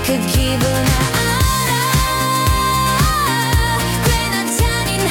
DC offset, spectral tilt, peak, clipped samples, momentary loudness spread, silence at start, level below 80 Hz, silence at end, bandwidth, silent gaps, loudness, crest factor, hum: under 0.1%; -4 dB/octave; -4 dBFS; under 0.1%; 2 LU; 0 s; -24 dBFS; 0 s; 18 kHz; none; -15 LUFS; 10 dB; none